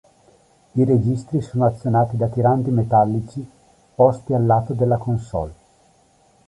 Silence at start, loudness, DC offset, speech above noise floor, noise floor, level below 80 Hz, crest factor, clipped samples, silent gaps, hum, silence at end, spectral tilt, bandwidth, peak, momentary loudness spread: 0.75 s; -19 LUFS; under 0.1%; 38 dB; -57 dBFS; -46 dBFS; 18 dB; under 0.1%; none; none; 0.95 s; -10 dB/octave; 10.5 kHz; -2 dBFS; 11 LU